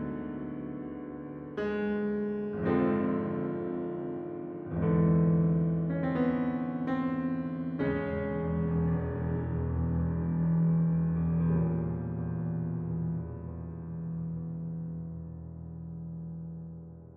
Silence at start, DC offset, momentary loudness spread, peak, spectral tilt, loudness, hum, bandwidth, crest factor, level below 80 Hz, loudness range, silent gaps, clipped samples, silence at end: 0 s; under 0.1%; 14 LU; -14 dBFS; -12 dB/octave; -32 LUFS; none; 4 kHz; 16 dB; -48 dBFS; 8 LU; none; under 0.1%; 0 s